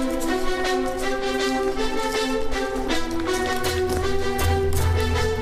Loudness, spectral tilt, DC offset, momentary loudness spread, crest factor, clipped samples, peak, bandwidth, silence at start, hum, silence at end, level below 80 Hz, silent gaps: -24 LUFS; -5 dB/octave; under 0.1%; 3 LU; 12 dB; under 0.1%; -10 dBFS; 15.5 kHz; 0 s; none; 0 s; -32 dBFS; none